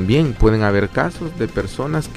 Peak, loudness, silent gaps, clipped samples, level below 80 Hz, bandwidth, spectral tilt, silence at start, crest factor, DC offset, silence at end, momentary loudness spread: -2 dBFS; -19 LUFS; none; under 0.1%; -28 dBFS; 13.5 kHz; -7 dB/octave; 0 s; 14 dB; under 0.1%; 0 s; 8 LU